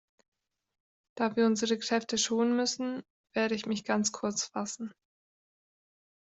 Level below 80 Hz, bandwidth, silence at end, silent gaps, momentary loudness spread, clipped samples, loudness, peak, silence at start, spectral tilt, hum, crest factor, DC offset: -74 dBFS; 8.2 kHz; 1.4 s; 3.10-3.24 s; 10 LU; under 0.1%; -30 LUFS; -14 dBFS; 1.15 s; -3 dB/octave; none; 18 dB; under 0.1%